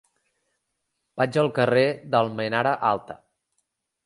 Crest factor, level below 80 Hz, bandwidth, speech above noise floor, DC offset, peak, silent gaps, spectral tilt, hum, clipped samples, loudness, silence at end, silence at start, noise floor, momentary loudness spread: 20 dB; -68 dBFS; 11.5 kHz; 55 dB; under 0.1%; -6 dBFS; none; -6.5 dB/octave; none; under 0.1%; -23 LUFS; 0.9 s; 1.15 s; -78 dBFS; 17 LU